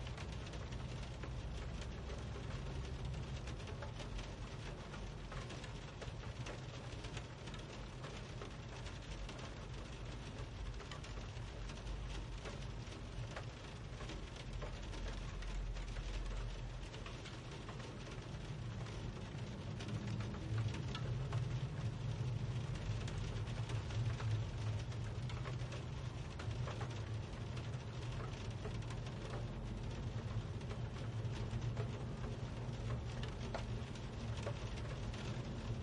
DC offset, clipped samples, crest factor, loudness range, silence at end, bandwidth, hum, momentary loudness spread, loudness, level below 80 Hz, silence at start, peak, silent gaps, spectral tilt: under 0.1%; under 0.1%; 16 dB; 6 LU; 0 s; 11 kHz; none; 7 LU; -46 LUFS; -50 dBFS; 0 s; -30 dBFS; none; -6 dB/octave